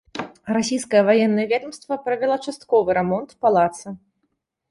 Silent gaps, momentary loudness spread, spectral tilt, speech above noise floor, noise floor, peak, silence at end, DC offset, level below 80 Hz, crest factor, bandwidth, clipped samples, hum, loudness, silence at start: none; 15 LU; -5 dB/octave; 54 dB; -73 dBFS; -4 dBFS; 0.75 s; under 0.1%; -60 dBFS; 16 dB; 11.5 kHz; under 0.1%; none; -20 LUFS; 0.15 s